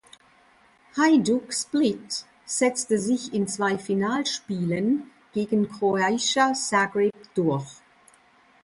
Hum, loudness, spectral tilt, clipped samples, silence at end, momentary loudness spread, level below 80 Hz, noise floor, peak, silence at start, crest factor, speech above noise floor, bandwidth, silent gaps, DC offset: none; -24 LUFS; -4 dB/octave; under 0.1%; 0.9 s; 10 LU; -66 dBFS; -58 dBFS; -8 dBFS; 0.95 s; 16 dB; 34 dB; 11.5 kHz; none; under 0.1%